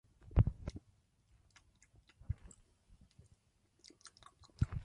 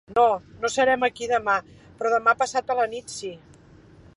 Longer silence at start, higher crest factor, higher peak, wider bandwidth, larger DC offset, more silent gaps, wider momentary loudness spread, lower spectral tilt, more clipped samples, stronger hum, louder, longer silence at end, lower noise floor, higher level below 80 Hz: first, 0.3 s vs 0.1 s; first, 28 dB vs 18 dB; second, -14 dBFS vs -6 dBFS; about the same, 10.5 kHz vs 11.5 kHz; neither; neither; first, 27 LU vs 12 LU; first, -7.5 dB/octave vs -3 dB/octave; neither; neither; second, -39 LUFS vs -23 LUFS; second, 0 s vs 0.8 s; first, -75 dBFS vs -50 dBFS; first, -46 dBFS vs -58 dBFS